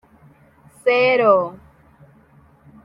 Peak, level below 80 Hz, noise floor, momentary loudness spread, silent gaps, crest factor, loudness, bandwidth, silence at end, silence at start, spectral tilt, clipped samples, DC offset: -2 dBFS; -62 dBFS; -52 dBFS; 10 LU; none; 18 dB; -17 LUFS; 10.5 kHz; 1.3 s; 0.85 s; -5.5 dB/octave; under 0.1%; under 0.1%